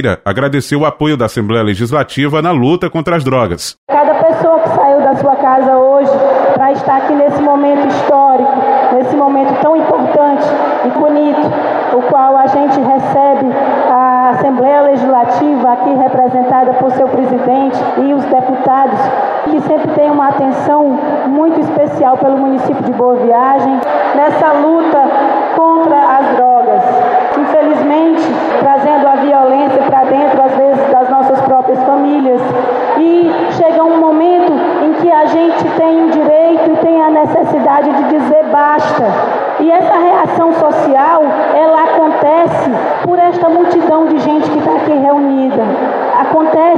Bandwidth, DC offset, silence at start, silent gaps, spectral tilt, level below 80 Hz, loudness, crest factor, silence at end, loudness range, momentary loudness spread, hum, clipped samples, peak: 12 kHz; under 0.1%; 0 s; 3.78-3.87 s; -7 dB/octave; -50 dBFS; -10 LUFS; 8 dB; 0 s; 2 LU; 4 LU; none; under 0.1%; 0 dBFS